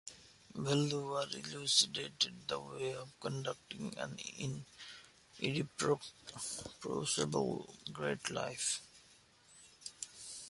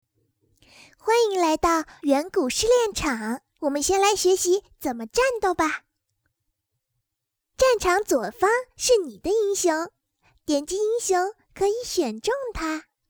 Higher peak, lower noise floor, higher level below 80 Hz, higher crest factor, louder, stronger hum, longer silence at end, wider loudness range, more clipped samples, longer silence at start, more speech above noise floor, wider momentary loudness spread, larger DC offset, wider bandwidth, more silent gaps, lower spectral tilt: second, -16 dBFS vs -6 dBFS; second, -65 dBFS vs -83 dBFS; second, -72 dBFS vs -50 dBFS; first, 24 dB vs 18 dB; second, -38 LUFS vs -23 LUFS; neither; second, 0 s vs 0.3 s; first, 6 LU vs 3 LU; neither; second, 0.05 s vs 1.05 s; second, 26 dB vs 60 dB; first, 17 LU vs 9 LU; neither; second, 11.5 kHz vs over 20 kHz; neither; about the same, -3 dB/octave vs -2.5 dB/octave